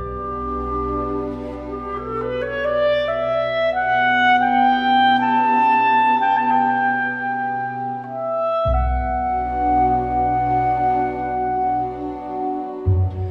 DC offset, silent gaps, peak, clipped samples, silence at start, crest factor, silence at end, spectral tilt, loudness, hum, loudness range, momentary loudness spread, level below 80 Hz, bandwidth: under 0.1%; none; -6 dBFS; under 0.1%; 0 s; 14 dB; 0 s; -7.5 dB/octave; -19 LUFS; none; 5 LU; 11 LU; -34 dBFS; 6.4 kHz